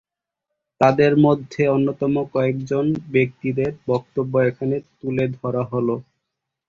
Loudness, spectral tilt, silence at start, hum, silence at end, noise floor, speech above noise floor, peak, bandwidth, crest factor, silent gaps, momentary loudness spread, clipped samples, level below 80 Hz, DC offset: -21 LUFS; -8.5 dB/octave; 0.8 s; none; 0.65 s; -82 dBFS; 62 dB; -2 dBFS; 7.2 kHz; 18 dB; none; 9 LU; under 0.1%; -56 dBFS; under 0.1%